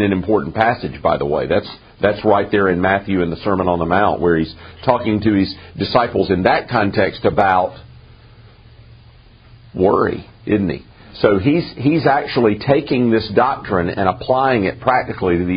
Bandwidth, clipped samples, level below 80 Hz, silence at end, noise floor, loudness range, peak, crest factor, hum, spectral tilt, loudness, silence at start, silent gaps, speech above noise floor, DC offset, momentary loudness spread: 5.2 kHz; under 0.1%; -42 dBFS; 0 s; -44 dBFS; 4 LU; 0 dBFS; 16 dB; none; -5 dB/octave; -17 LUFS; 0 s; none; 28 dB; under 0.1%; 5 LU